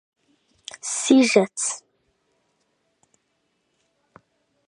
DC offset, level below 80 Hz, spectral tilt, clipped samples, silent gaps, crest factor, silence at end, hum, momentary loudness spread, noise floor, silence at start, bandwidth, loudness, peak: under 0.1%; -76 dBFS; -3 dB/octave; under 0.1%; none; 24 dB; 2.9 s; none; 22 LU; -72 dBFS; 0.85 s; 11 kHz; -20 LUFS; -2 dBFS